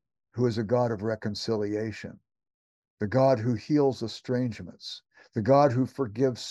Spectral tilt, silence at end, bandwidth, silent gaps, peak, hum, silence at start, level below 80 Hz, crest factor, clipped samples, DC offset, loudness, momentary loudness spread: -7 dB/octave; 0 s; 11.5 kHz; 2.54-2.83 s, 2.90-2.97 s; -8 dBFS; none; 0.35 s; -66 dBFS; 18 dB; under 0.1%; under 0.1%; -27 LUFS; 17 LU